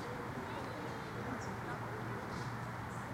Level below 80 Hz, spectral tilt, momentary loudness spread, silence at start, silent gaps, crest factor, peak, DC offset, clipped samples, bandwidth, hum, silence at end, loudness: -62 dBFS; -6 dB/octave; 1 LU; 0 s; none; 14 dB; -30 dBFS; under 0.1%; under 0.1%; 16.5 kHz; none; 0 s; -43 LUFS